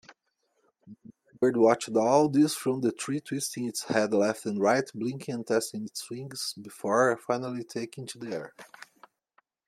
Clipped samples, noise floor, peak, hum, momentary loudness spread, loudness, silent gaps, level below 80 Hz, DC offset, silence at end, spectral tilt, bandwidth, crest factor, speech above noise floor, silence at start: under 0.1%; -76 dBFS; -8 dBFS; none; 14 LU; -28 LUFS; none; -74 dBFS; under 0.1%; 1.05 s; -4.5 dB/octave; 16 kHz; 22 dB; 48 dB; 0.1 s